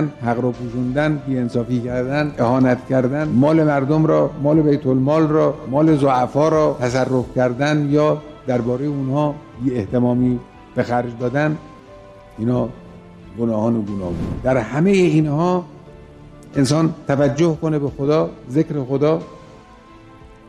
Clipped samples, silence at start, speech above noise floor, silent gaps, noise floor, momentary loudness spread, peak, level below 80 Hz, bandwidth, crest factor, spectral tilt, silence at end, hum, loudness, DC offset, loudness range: under 0.1%; 0 s; 26 dB; none; -43 dBFS; 8 LU; -4 dBFS; -44 dBFS; 11 kHz; 14 dB; -7.5 dB/octave; 0.2 s; none; -18 LUFS; under 0.1%; 6 LU